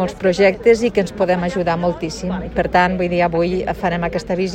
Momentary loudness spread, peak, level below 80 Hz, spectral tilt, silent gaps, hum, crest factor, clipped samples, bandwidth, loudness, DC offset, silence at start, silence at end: 7 LU; -2 dBFS; -38 dBFS; -6 dB/octave; none; none; 16 dB; under 0.1%; 9.8 kHz; -18 LUFS; under 0.1%; 0 s; 0 s